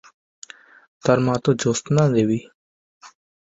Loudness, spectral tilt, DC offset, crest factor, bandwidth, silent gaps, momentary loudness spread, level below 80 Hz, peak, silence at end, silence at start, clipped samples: -20 LUFS; -6 dB/octave; under 0.1%; 20 dB; 8 kHz; 2.54-3.01 s; 23 LU; -56 dBFS; -2 dBFS; 0.5 s; 1.05 s; under 0.1%